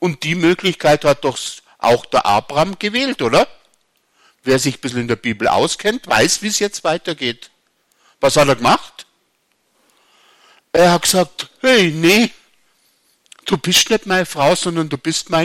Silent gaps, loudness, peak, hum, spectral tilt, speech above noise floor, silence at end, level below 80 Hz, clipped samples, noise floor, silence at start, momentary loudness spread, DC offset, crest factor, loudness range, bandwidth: none; -16 LUFS; -2 dBFS; none; -3.5 dB/octave; 49 dB; 0 s; -48 dBFS; under 0.1%; -64 dBFS; 0 s; 9 LU; under 0.1%; 16 dB; 3 LU; 16.5 kHz